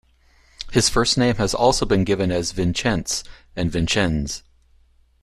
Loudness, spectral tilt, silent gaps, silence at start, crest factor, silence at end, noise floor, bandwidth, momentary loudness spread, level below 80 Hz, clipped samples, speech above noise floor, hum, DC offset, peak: -20 LUFS; -4 dB/octave; none; 0.6 s; 18 dB; 0.85 s; -56 dBFS; 14 kHz; 9 LU; -36 dBFS; under 0.1%; 36 dB; none; under 0.1%; -2 dBFS